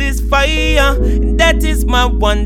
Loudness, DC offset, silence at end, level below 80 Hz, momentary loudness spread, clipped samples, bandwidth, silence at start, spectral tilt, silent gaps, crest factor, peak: -13 LUFS; under 0.1%; 0 s; -14 dBFS; 3 LU; under 0.1%; 15 kHz; 0 s; -4.5 dB/octave; none; 12 dB; 0 dBFS